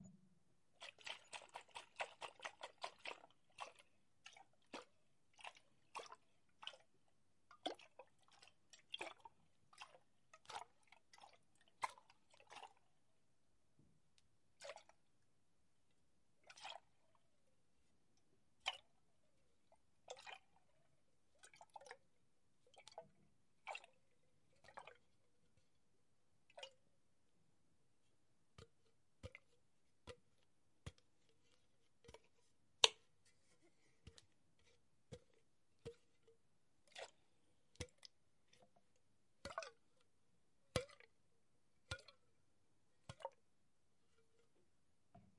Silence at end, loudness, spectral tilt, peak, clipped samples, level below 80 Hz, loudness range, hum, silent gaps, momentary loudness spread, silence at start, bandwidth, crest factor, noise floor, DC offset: 0.15 s; -50 LUFS; -1.5 dB/octave; -14 dBFS; under 0.1%; -80 dBFS; 22 LU; none; none; 18 LU; 0 s; 11 kHz; 44 dB; -86 dBFS; under 0.1%